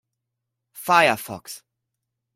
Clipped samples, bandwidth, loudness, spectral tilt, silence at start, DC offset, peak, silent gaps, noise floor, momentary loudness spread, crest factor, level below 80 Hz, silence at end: under 0.1%; 16.5 kHz; -19 LUFS; -3 dB/octave; 0.75 s; under 0.1%; -2 dBFS; none; -82 dBFS; 22 LU; 22 dB; -68 dBFS; 0.8 s